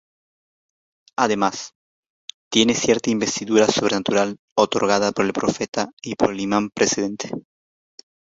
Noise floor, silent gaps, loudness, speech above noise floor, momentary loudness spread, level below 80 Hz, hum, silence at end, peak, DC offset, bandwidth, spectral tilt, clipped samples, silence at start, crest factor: under -90 dBFS; 1.75-2.03 s, 2.09-2.28 s, 2.34-2.51 s, 4.39-4.56 s, 5.68-5.72 s, 5.93-5.97 s; -20 LUFS; over 70 dB; 15 LU; -58 dBFS; none; 1 s; -2 dBFS; under 0.1%; 8 kHz; -3.5 dB/octave; under 0.1%; 1.2 s; 20 dB